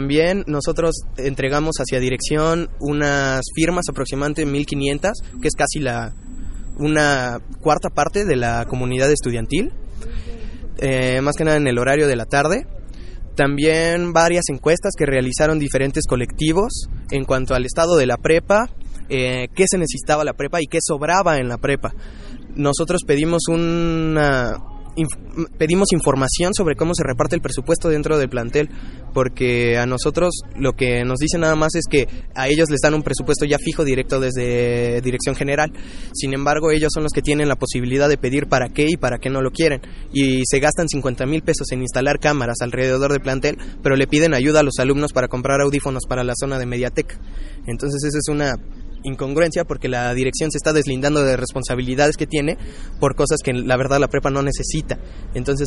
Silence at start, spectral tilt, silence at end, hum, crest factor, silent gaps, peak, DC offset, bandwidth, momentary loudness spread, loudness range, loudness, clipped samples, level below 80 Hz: 0 s; -5 dB/octave; 0 s; none; 18 dB; none; -2 dBFS; under 0.1%; 11.5 kHz; 10 LU; 3 LU; -19 LUFS; under 0.1%; -30 dBFS